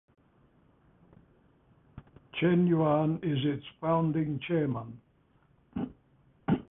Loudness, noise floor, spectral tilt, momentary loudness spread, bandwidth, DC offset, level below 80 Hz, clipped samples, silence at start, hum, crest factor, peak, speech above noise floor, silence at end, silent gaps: -30 LUFS; -66 dBFS; -11.5 dB/octave; 15 LU; 3.8 kHz; under 0.1%; -62 dBFS; under 0.1%; 1.95 s; none; 18 dB; -14 dBFS; 38 dB; 0.1 s; none